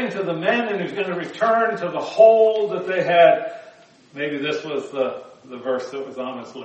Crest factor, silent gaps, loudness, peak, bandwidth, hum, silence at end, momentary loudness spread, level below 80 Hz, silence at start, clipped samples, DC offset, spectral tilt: 18 dB; none; -20 LUFS; -2 dBFS; 8.2 kHz; none; 0 s; 17 LU; -74 dBFS; 0 s; under 0.1%; under 0.1%; -5.5 dB/octave